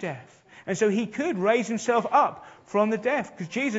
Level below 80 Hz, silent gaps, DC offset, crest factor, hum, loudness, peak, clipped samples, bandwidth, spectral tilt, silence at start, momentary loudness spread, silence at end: -72 dBFS; none; under 0.1%; 18 dB; none; -25 LUFS; -8 dBFS; under 0.1%; 8 kHz; -5 dB/octave; 0 s; 12 LU; 0 s